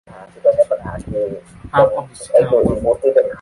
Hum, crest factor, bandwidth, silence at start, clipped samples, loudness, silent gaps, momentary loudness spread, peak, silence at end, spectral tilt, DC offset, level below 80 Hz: none; 16 dB; 11.5 kHz; 0.1 s; under 0.1%; -17 LUFS; none; 11 LU; -2 dBFS; 0 s; -7 dB/octave; under 0.1%; -40 dBFS